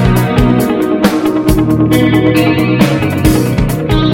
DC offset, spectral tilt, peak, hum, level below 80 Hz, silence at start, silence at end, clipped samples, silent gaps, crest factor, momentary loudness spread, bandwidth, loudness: under 0.1%; -6.5 dB/octave; 0 dBFS; none; -22 dBFS; 0 s; 0 s; 0.6%; none; 10 dB; 3 LU; 17 kHz; -11 LUFS